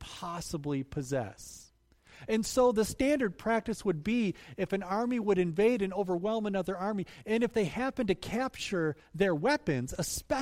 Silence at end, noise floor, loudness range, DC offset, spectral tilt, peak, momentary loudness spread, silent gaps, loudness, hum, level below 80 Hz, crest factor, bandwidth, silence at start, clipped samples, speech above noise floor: 0 s; -62 dBFS; 2 LU; under 0.1%; -5.5 dB/octave; -16 dBFS; 9 LU; none; -31 LUFS; none; -54 dBFS; 16 dB; 16 kHz; 0 s; under 0.1%; 31 dB